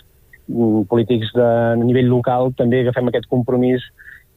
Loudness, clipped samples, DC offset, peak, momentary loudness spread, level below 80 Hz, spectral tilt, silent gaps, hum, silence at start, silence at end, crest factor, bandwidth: -17 LUFS; under 0.1%; under 0.1%; -4 dBFS; 5 LU; -50 dBFS; -9.5 dB/octave; none; none; 0.5 s; 0.2 s; 14 dB; 4.1 kHz